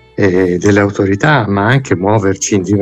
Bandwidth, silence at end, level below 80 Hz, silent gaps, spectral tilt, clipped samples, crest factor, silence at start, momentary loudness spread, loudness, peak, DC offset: 9 kHz; 0 s; -44 dBFS; none; -5.5 dB/octave; under 0.1%; 12 dB; 0.2 s; 2 LU; -12 LUFS; 0 dBFS; under 0.1%